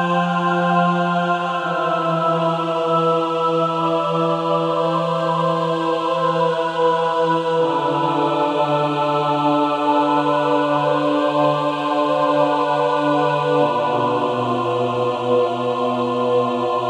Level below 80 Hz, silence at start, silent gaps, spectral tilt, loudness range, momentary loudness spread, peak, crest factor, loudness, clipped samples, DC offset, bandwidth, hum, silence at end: -70 dBFS; 0 s; none; -6.5 dB/octave; 1 LU; 3 LU; -4 dBFS; 14 dB; -19 LUFS; under 0.1%; under 0.1%; 10.5 kHz; none; 0 s